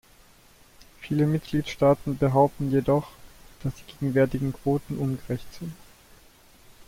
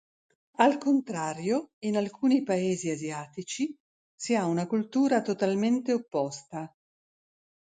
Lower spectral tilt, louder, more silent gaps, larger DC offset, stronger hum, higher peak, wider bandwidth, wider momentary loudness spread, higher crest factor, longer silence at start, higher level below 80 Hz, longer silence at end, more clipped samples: first, -8 dB/octave vs -5.5 dB/octave; about the same, -26 LUFS vs -28 LUFS; second, none vs 1.73-1.82 s, 3.80-4.18 s; neither; neither; about the same, -8 dBFS vs -8 dBFS; first, 16.5 kHz vs 9.4 kHz; about the same, 14 LU vs 13 LU; about the same, 20 dB vs 20 dB; first, 0.8 s vs 0.6 s; first, -50 dBFS vs -76 dBFS; second, 0.05 s vs 1.1 s; neither